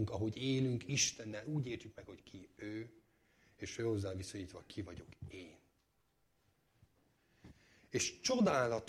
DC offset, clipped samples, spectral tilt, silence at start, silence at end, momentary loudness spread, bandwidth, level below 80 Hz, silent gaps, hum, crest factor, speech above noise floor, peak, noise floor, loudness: under 0.1%; under 0.1%; -4 dB/octave; 0 s; 0 s; 21 LU; 14 kHz; -68 dBFS; none; none; 20 dB; 39 dB; -20 dBFS; -78 dBFS; -38 LUFS